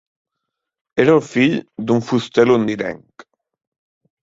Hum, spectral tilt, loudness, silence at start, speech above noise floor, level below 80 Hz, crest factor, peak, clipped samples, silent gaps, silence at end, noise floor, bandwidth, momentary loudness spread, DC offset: none; -6.5 dB/octave; -17 LUFS; 0.95 s; 64 dB; -58 dBFS; 18 dB; -2 dBFS; under 0.1%; none; 1.25 s; -80 dBFS; 7.8 kHz; 11 LU; under 0.1%